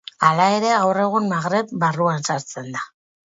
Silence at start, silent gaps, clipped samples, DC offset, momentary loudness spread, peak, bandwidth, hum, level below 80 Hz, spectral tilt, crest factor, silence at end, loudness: 0.2 s; none; under 0.1%; under 0.1%; 13 LU; 0 dBFS; 8 kHz; none; -66 dBFS; -5 dB/octave; 20 dB; 0.4 s; -20 LUFS